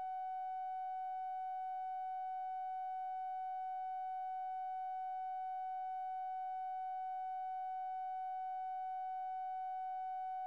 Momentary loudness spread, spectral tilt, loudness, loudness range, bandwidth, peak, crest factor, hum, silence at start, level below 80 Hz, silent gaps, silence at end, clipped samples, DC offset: 0 LU; -1 dB/octave; -43 LUFS; 0 LU; 4.8 kHz; -38 dBFS; 4 dB; none; 0 s; under -90 dBFS; none; 0 s; under 0.1%; under 0.1%